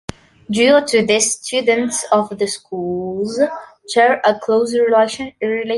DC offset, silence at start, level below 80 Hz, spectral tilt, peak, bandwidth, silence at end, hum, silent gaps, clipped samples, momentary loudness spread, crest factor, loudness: under 0.1%; 0.5 s; -54 dBFS; -3 dB/octave; -2 dBFS; 11.5 kHz; 0 s; none; none; under 0.1%; 10 LU; 14 dB; -16 LUFS